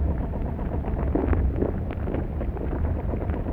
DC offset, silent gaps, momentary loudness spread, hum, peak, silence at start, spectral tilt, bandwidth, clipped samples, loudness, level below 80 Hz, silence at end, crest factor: under 0.1%; none; 5 LU; none; -10 dBFS; 0 s; -11 dB/octave; 3.6 kHz; under 0.1%; -28 LUFS; -28 dBFS; 0 s; 16 dB